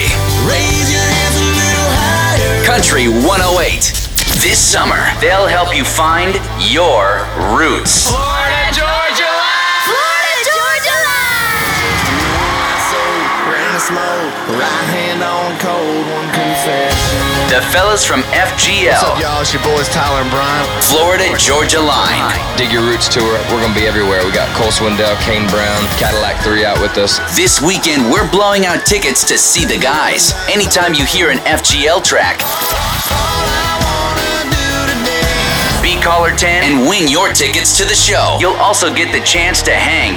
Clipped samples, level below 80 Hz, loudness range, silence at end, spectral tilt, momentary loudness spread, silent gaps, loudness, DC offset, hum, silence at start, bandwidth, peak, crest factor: under 0.1%; -26 dBFS; 4 LU; 0 s; -2.5 dB/octave; 5 LU; none; -11 LUFS; under 0.1%; none; 0 s; over 20 kHz; 0 dBFS; 10 dB